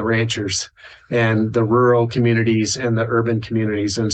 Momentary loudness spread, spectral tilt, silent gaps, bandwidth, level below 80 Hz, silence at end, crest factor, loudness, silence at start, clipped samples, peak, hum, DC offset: 6 LU; -5.5 dB/octave; none; 9 kHz; -52 dBFS; 0 s; 14 dB; -18 LUFS; 0 s; under 0.1%; -4 dBFS; none; under 0.1%